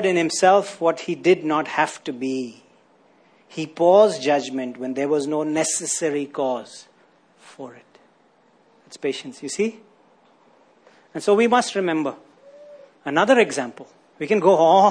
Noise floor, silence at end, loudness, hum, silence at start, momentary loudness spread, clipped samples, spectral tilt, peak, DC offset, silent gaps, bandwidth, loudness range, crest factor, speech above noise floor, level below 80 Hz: -58 dBFS; 0 s; -20 LUFS; none; 0 s; 17 LU; under 0.1%; -4 dB/octave; -4 dBFS; under 0.1%; none; 10.5 kHz; 11 LU; 18 dB; 38 dB; -74 dBFS